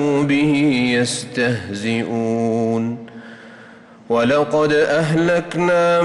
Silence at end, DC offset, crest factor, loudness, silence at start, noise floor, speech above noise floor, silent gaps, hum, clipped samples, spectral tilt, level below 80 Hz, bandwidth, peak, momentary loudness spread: 0 s; under 0.1%; 10 dB; -18 LUFS; 0 s; -42 dBFS; 25 dB; none; none; under 0.1%; -5.5 dB/octave; -54 dBFS; 11.5 kHz; -8 dBFS; 7 LU